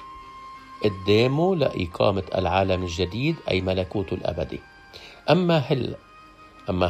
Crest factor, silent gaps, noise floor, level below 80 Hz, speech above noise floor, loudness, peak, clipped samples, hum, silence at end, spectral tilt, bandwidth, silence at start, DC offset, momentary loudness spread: 20 dB; none; -48 dBFS; -50 dBFS; 26 dB; -24 LUFS; -4 dBFS; under 0.1%; none; 0 s; -7 dB/octave; 14 kHz; 0 s; under 0.1%; 21 LU